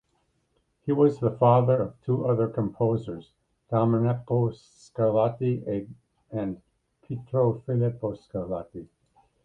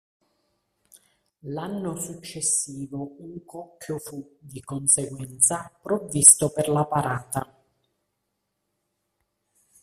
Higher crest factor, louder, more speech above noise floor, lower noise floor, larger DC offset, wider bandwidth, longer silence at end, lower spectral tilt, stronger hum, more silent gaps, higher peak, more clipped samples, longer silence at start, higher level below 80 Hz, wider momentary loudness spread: second, 20 dB vs 26 dB; second, -26 LUFS vs -21 LUFS; second, 46 dB vs 53 dB; second, -72 dBFS vs -78 dBFS; neither; second, 7.4 kHz vs 15.5 kHz; second, 0.6 s vs 2.4 s; first, -10.5 dB/octave vs -3.5 dB/octave; neither; neither; second, -6 dBFS vs 0 dBFS; neither; second, 0.85 s vs 1.45 s; about the same, -58 dBFS vs -62 dBFS; second, 16 LU vs 26 LU